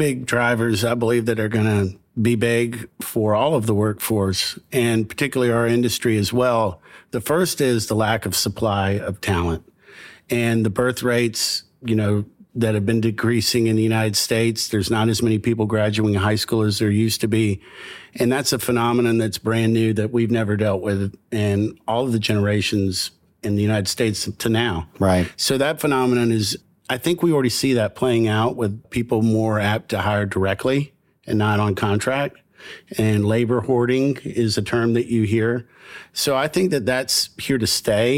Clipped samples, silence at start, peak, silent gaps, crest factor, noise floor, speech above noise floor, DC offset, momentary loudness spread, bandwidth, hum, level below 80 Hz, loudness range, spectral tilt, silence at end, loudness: under 0.1%; 0 s; -6 dBFS; none; 14 dB; -44 dBFS; 24 dB; under 0.1%; 6 LU; 17 kHz; none; -50 dBFS; 2 LU; -5 dB/octave; 0 s; -20 LUFS